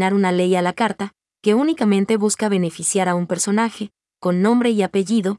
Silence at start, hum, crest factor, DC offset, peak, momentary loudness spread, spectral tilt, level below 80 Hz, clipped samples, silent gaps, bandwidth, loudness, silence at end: 0 s; none; 14 dB; under 0.1%; -4 dBFS; 7 LU; -5 dB/octave; -68 dBFS; under 0.1%; none; 12 kHz; -19 LUFS; 0 s